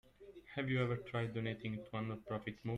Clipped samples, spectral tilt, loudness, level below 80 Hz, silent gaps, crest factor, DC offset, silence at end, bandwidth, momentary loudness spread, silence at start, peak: under 0.1%; -8 dB/octave; -41 LUFS; -68 dBFS; none; 18 dB; under 0.1%; 0 s; 8.2 kHz; 9 LU; 0.2 s; -24 dBFS